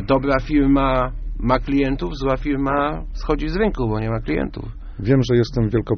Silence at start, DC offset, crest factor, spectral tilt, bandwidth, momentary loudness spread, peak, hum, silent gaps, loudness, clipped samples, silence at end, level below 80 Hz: 0 s; under 0.1%; 16 dB; -6.5 dB/octave; 6.6 kHz; 10 LU; -4 dBFS; none; none; -20 LUFS; under 0.1%; 0 s; -28 dBFS